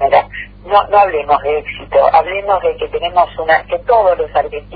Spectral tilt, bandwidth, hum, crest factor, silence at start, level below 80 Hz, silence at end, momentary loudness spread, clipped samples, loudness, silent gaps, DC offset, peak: -7 dB/octave; 5 kHz; 50 Hz at -35 dBFS; 14 dB; 0 s; -38 dBFS; 0 s; 7 LU; under 0.1%; -13 LUFS; none; under 0.1%; 0 dBFS